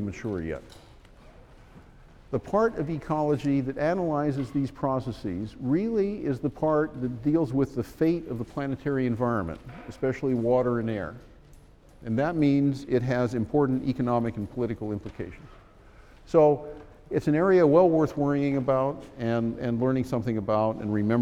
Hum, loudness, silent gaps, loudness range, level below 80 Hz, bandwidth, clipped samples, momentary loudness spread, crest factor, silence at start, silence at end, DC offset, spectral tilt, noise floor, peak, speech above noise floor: none; -26 LUFS; none; 5 LU; -50 dBFS; 11.5 kHz; under 0.1%; 11 LU; 20 dB; 0 s; 0 s; under 0.1%; -8.5 dB/octave; -52 dBFS; -8 dBFS; 26 dB